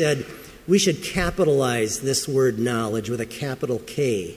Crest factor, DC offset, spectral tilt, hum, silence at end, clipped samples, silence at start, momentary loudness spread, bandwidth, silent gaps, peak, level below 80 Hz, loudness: 16 dB; under 0.1%; -4.5 dB/octave; none; 0 s; under 0.1%; 0 s; 9 LU; 16 kHz; none; -6 dBFS; -44 dBFS; -23 LUFS